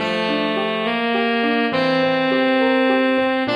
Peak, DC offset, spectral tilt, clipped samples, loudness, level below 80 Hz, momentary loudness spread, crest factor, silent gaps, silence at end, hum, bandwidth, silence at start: -6 dBFS; under 0.1%; -6 dB/octave; under 0.1%; -18 LUFS; -60 dBFS; 4 LU; 12 dB; none; 0 s; none; 9.4 kHz; 0 s